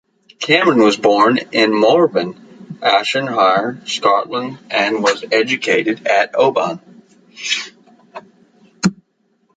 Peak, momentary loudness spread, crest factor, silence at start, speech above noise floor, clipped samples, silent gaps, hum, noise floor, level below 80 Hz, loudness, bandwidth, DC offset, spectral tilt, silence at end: 0 dBFS; 11 LU; 16 dB; 0.4 s; 47 dB; under 0.1%; none; none; -62 dBFS; -62 dBFS; -15 LUFS; 9.4 kHz; under 0.1%; -4 dB/octave; 0.65 s